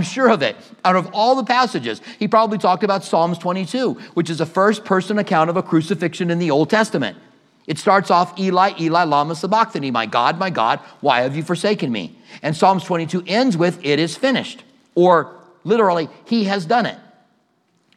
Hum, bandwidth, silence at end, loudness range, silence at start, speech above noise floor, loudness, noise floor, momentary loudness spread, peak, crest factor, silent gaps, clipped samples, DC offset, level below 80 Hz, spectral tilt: none; 12.5 kHz; 0.95 s; 2 LU; 0 s; 45 dB; -18 LUFS; -63 dBFS; 8 LU; 0 dBFS; 18 dB; none; under 0.1%; under 0.1%; -76 dBFS; -5.5 dB/octave